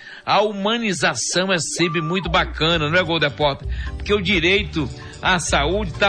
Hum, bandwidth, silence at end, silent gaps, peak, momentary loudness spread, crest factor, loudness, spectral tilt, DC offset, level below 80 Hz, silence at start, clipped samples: none; 10.5 kHz; 0 s; none; -6 dBFS; 8 LU; 14 dB; -19 LUFS; -3.5 dB/octave; 0.1%; -34 dBFS; 0 s; under 0.1%